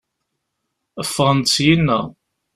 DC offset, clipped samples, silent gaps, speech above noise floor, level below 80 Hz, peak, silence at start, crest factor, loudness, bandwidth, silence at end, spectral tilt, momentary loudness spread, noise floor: under 0.1%; under 0.1%; none; 59 dB; -48 dBFS; -2 dBFS; 0.95 s; 18 dB; -17 LUFS; 13.5 kHz; 0.45 s; -4.5 dB/octave; 12 LU; -76 dBFS